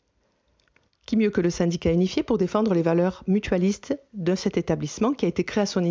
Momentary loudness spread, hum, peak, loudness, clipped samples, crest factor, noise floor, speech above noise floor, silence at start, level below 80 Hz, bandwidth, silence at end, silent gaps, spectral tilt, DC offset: 5 LU; none; -8 dBFS; -24 LUFS; under 0.1%; 16 dB; -69 dBFS; 46 dB; 1.1 s; -48 dBFS; 7.6 kHz; 0 s; none; -6.5 dB/octave; under 0.1%